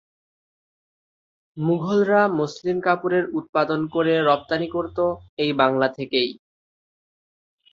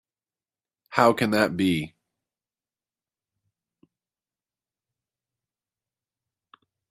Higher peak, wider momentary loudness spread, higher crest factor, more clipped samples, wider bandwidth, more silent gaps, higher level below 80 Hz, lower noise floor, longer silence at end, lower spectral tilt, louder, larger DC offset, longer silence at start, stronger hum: about the same, -2 dBFS vs -2 dBFS; second, 6 LU vs 10 LU; second, 20 dB vs 28 dB; neither; second, 7.4 kHz vs 14.5 kHz; first, 3.49-3.53 s, 5.29-5.37 s vs none; first, -60 dBFS vs -66 dBFS; about the same, under -90 dBFS vs under -90 dBFS; second, 1.4 s vs 5.05 s; about the same, -6.5 dB/octave vs -5.5 dB/octave; about the same, -22 LUFS vs -23 LUFS; neither; first, 1.55 s vs 0.9 s; neither